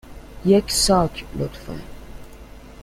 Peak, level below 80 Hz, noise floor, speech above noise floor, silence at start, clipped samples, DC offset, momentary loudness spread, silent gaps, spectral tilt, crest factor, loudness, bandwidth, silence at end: -4 dBFS; -38 dBFS; -41 dBFS; 21 dB; 0.05 s; under 0.1%; under 0.1%; 19 LU; none; -4.5 dB/octave; 18 dB; -20 LUFS; 16 kHz; 0 s